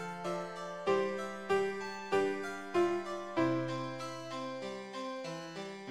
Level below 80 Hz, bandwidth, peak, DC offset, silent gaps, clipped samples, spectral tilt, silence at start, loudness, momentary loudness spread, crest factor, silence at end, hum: -76 dBFS; 13 kHz; -18 dBFS; 0.2%; none; under 0.1%; -5.5 dB/octave; 0 s; -36 LUFS; 9 LU; 18 dB; 0 s; none